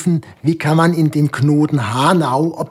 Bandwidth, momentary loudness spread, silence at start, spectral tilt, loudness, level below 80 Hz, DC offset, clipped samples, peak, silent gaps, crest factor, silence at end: 15 kHz; 5 LU; 0 s; -7 dB/octave; -15 LUFS; -58 dBFS; under 0.1%; under 0.1%; -2 dBFS; none; 14 dB; 0 s